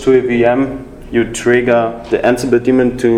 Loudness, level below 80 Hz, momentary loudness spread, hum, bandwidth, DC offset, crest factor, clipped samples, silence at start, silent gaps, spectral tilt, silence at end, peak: -13 LUFS; -38 dBFS; 6 LU; none; 13 kHz; under 0.1%; 12 dB; under 0.1%; 0 s; none; -6 dB/octave; 0 s; 0 dBFS